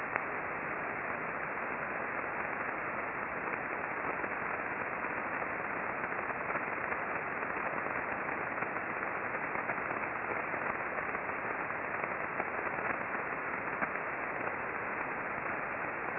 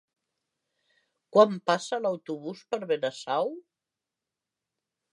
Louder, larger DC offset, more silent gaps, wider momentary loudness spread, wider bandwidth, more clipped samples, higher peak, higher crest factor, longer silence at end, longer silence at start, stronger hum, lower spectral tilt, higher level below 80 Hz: second, -36 LUFS vs -27 LUFS; neither; neither; second, 1 LU vs 14 LU; second, 5.2 kHz vs 11 kHz; neither; second, -12 dBFS vs -8 dBFS; about the same, 24 dB vs 22 dB; second, 0 s vs 1.5 s; second, 0 s vs 1.35 s; neither; about the same, -5 dB/octave vs -5 dB/octave; first, -66 dBFS vs -88 dBFS